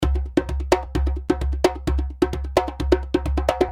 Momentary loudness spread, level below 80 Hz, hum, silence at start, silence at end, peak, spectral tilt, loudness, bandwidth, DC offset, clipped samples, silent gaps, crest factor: 4 LU; -26 dBFS; none; 0 s; 0 s; -2 dBFS; -6.5 dB/octave; -23 LUFS; 13.5 kHz; under 0.1%; under 0.1%; none; 20 dB